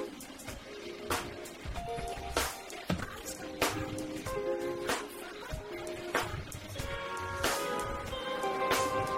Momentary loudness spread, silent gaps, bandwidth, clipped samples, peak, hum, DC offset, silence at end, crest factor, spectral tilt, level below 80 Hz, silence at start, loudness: 11 LU; none; 16 kHz; under 0.1%; -14 dBFS; none; under 0.1%; 0 s; 22 dB; -3.5 dB/octave; -50 dBFS; 0 s; -36 LUFS